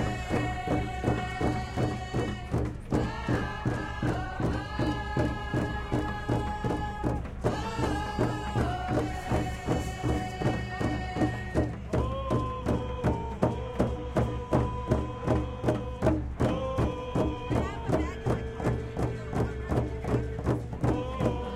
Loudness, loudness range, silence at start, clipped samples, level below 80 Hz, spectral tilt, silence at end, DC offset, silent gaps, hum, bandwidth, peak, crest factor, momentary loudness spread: -31 LUFS; 1 LU; 0 s; under 0.1%; -38 dBFS; -7 dB/octave; 0 s; under 0.1%; none; none; 12.5 kHz; -10 dBFS; 20 dB; 3 LU